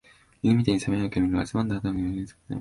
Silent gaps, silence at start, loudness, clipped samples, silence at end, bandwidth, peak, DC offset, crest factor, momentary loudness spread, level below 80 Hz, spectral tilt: none; 0.45 s; -26 LUFS; under 0.1%; 0 s; 11.5 kHz; -6 dBFS; under 0.1%; 20 dB; 8 LU; -46 dBFS; -7 dB/octave